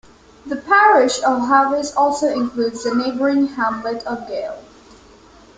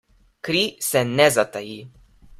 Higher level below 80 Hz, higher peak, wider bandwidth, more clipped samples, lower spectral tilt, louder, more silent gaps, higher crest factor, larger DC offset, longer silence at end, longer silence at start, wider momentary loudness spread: about the same, -54 dBFS vs -56 dBFS; about the same, -2 dBFS vs -2 dBFS; second, 9.4 kHz vs 16 kHz; neither; about the same, -3.5 dB/octave vs -3.5 dB/octave; first, -17 LUFS vs -20 LUFS; neither; about the same, 16 dB vs 20 dB; neither; first, 0.95 s vs 0.05 s; about the same, 0.45 s vs 0.45 s; second, 14 LU vs 19 LU